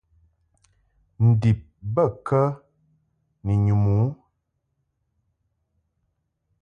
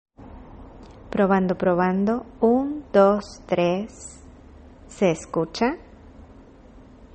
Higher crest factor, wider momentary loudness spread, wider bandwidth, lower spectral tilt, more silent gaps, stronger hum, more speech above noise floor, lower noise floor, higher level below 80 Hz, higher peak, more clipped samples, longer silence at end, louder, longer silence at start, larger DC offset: about the same, 18 dB vs 20 dB; second, 8 LU vs 18 LU; second, 5.4 kHz vs 8.8 kHz; first, -10.5 dB/octave vs -6.5 dB/octave; neither; neither; first, 55 dB vs 26 dB; first, -75 dBFS vs -47 dBFS; about the same, -46 dBFS vs -48 dBFS; second, -8 dBFS vs -4 dBFS; neither; first, 2.45 s vs 0.95 s; about the same, -22 LUFS vs -22 LUFS; first, 1.2 s vs 0.2 s; neither